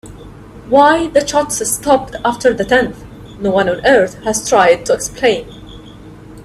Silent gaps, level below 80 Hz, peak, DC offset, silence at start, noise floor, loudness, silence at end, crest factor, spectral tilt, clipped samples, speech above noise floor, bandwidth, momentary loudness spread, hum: none; -40 dBFS; 0 dBFS; under 0.1%; 0.05 s; -35 dBFS; -13 LUFS; 0 s; 14 dB; -3.5 dB/octave; under 0.1%; 22 dB; 14.5 kHz; 11 LU; none